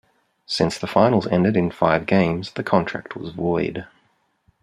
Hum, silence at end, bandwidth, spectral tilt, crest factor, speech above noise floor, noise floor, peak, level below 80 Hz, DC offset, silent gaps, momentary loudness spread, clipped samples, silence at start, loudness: none; 0.75 s; 11.5 kHz; -6.5 dB/octave; 20 dB; 45 dB; -65 dBFS; -2 dBFS; -54 dBFS; under 0.1%; none; 11 LU; under 0.1%; 0.5 s; -21 LUFS